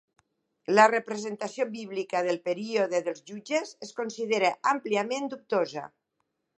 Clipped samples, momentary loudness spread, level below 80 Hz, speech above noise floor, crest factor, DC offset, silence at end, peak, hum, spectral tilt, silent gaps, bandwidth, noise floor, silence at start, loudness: under 0.1%; 14 LU; -84 dBFS; 52 dB; 24 dB; under 0.1%; 0.7 s; -6 dBFS; none; -4 dB/octave; none; 10 kHz; -80 dBFS; 0.7 s; -28 LUFS